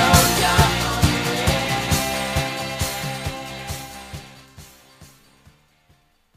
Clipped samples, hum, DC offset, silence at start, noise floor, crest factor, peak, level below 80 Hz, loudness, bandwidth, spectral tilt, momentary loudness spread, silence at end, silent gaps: under 0.1%; none; under 0.1%; 0 s; -59 dBFS; 20 dB; -2 dBFS; -34 dBFS; -20 LUFS; 15.5 kHz; -3.5 dB/octave; 16 LU; 1.35 s; none